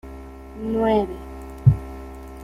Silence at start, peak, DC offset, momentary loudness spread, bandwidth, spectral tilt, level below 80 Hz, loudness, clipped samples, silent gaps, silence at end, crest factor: 0.05 s; -2 dBFS; under 0.1%; 20 LU; 13.5 kHz; -9 dB/octave; -38 dBFS; -22 LUFS; under 0.1%; none; 0 s; 20 dB